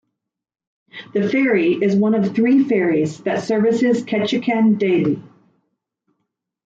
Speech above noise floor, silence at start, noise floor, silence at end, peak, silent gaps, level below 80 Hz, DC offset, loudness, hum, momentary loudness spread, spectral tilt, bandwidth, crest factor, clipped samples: 62 dB; 0.95 s; -79 dBFS; 1.4 s; -6 dBFS; none; -64 dBFS; under 0.1%; -18 LUFS; none; 7 LU; -7 dB/octave; 7.8 kHz; 14 dB; under 0.1%